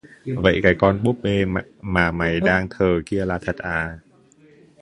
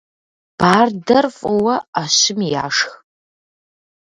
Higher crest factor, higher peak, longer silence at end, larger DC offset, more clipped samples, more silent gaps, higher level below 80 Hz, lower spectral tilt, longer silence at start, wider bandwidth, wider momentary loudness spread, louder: about the same, 20 dB vs 18 dB; about the same, 0 dBFS vs 0 dBFS; second, 0.85 s vs 1.1 s; neither; neither; second, none vs 1.88-1.93 s; first, -40 dBFS vs -54 dBFS; first, -7 dB/octave vs -3 dB/octave; second, 0.25 s vs 0.6 s; about the same, 11 kHz vs 11.5 kHz; first, 9 LU vs 6 LU; second, -21 LUFS vs -16 LUFS